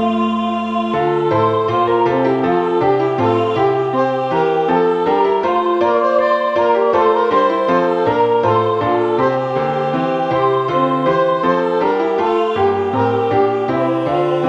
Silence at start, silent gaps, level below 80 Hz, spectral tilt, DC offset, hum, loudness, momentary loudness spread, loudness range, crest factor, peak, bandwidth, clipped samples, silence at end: 0 s; none; -54 dBFS; -7.5 dB/octave; under 0.1%; none; -15 LUFS; 3 LU; 2 LU; 14 dB; -2 dBFS; 7.8 kHz; under 0.1%; 0 s